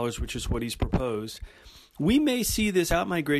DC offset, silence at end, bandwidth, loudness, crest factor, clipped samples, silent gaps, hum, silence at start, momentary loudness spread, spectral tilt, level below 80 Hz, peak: under 0.1%; 0 s; 14 kHz; -26 LUFS; 16 dB; under 0.1%; none; none; 0 s; 12 LU; -4.5 dB/octave; -38 dBFS; -12 dBFS